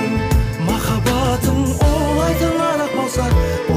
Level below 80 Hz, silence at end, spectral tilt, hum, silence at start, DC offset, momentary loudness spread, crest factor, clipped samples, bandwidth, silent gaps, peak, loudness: -22 dBFS; 0 s; -6 dB/octave; none; 0 s; under 0.1%; 3 LU; 12 dB; under 0.1%; 16 kHz; none; -6 dBFS; -17 LUFS